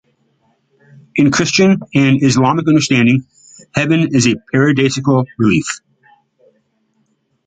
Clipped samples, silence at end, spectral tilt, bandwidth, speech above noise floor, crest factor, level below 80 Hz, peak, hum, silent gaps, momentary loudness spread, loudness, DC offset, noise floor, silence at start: under 0.1%; 1.7 s; -5.5 dB/octave; 9.4 kHz; 50 dB; 14 dB; -50 dBFS; 0 dBFS; none; none; 7 LU; -13 LUFS; under 0.1%; -62 dBFS; 1.15 s